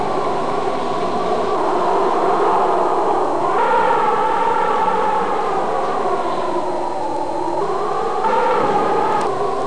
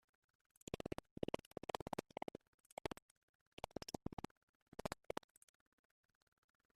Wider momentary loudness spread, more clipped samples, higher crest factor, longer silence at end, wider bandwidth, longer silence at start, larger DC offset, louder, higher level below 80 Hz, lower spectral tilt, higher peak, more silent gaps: second, 5 LU vs 11 LU; neither; second, 12 dB vs 30 dB; second, 0 s vs 1.8 s; second, 10.5 kHz vs 14.5 kHz; second, 0 s vs 0.75 s; first, 5% vs under 0.1%; first, -18 LUFS vs -51 LUFS; first, -54 dBFS vs -68 dBFS; about the same, -5.5 dB/octave vs -5 dB/octave; first, -4 dBFS vs -22 dBFS; second, none vs 1.11-1.17 s, 1.46-1.51 s, 1.82-1.86 s, 2.48-2.77 s, 3.02-3.57 s, 4.13-4.17 s, 4.31-4.72 s